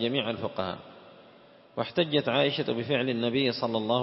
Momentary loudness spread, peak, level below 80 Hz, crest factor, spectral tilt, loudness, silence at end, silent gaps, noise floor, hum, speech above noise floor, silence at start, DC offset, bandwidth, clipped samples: 10 LU; -10 dBFS; -70 dBFS; 18 dB; -9.5 dB/octave; -28 LUFS; 0 s; none; -55 dBFS; none; 27 dB; 0 s; under 0.1%; 5.8 kHz; under 0.1%